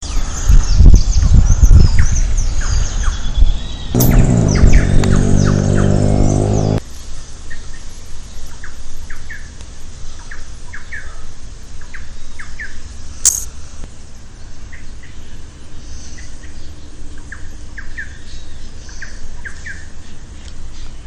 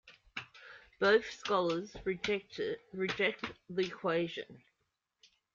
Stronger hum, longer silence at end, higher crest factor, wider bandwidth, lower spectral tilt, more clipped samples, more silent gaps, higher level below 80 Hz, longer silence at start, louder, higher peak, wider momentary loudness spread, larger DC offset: neither; second, 0 s vs 0.95 s; second, 14 dB vs 20 dB; first, 19 kHz vs 7.4 kHz; about the same, -5.5 dB/octave vs -5 dB/octave; first, 1% vs under 0.1%; neither; first, -16 dBFS vs -68 dBFS; about the same, 0 s vs 0.05 s; first, -14 LUFS vs -34 LUFS; first, 0 dBFS vs -16 dBFS; first, 24 LU vs 17 LU; neither